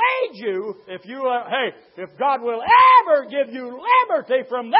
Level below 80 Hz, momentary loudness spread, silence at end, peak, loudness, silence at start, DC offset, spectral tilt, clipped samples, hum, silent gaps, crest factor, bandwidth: -66 dBFS; 19 LU; 0 s; -2 dBFS; -18 LUFS; 0 s; under 0.1%; -8 dB/octave; under 0.1%; none; none; 16 dB; 5.6 kHz